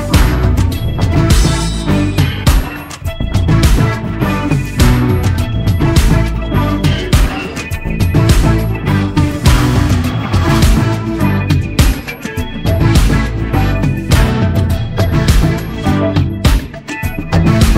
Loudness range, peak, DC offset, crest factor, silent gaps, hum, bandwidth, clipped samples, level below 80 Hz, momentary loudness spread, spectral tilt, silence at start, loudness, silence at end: 1 LU; 0 dBFS; under 0.1%; 12 dB; none; none; 16.5 kHz; under 0.1%; -16 dBFS; 7 LU; -6 dB/octave; 0 s; -13 LUFS; 0 s